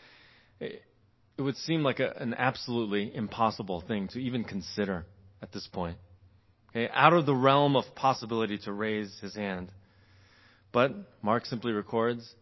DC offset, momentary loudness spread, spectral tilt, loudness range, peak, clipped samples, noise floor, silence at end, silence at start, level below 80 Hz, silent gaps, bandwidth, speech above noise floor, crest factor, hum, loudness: under 0.1%; 18 LU; -6.5 dB/octave; 7 LU; -4 dBFS; under 0.1%; -61 dBFS; 0.1 s; 0.6 s; -60 dBFS; none; 6.2 kHz; 32 dB; 26 dB; none; -30 LUFS